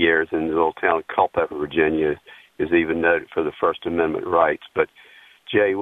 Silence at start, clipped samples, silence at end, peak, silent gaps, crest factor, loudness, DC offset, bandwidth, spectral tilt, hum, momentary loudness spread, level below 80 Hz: 0 s; under 0.1%; 0 s; -2 dBFS; none; 20 dB; -21 LUFS; under 0.1%; 4 kHz; -7.5 dB/octave; none; 5 LU; -52 dBFS